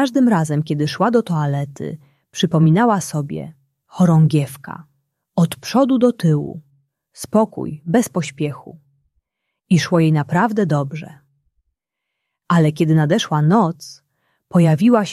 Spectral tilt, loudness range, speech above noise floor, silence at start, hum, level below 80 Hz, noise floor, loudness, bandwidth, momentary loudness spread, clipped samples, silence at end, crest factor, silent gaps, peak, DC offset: -7 dB/octave; 2 LU; 63 dB; 0 s; none; -58 dBFS; -79 dBFS; -17 LUFS; 13 kHz; 17 LU; under 0.1%; 0 s; 16 dB; none; -2 dBFS; under 0.1%